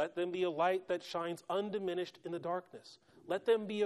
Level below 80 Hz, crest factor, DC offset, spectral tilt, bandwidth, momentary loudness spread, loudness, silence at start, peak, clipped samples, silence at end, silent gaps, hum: -84 dBFS; 16 dB; under 0.1%; -5.5 dB/octave; 13 kHz; 9 LU; -37 LUFS; 0 s; -20 dBFS; under 0.1%; 0 s; none; none